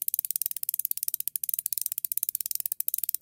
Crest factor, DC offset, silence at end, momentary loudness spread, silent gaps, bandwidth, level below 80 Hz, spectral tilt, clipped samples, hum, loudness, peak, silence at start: 28 dB; under 0.1%; 0.05 s; 2 LU; none; 17.5 kHz; -82 dBFS; 3.5 dB/octave; under 0.1%; none; -28 LUFS; -2 dBFS; 0 s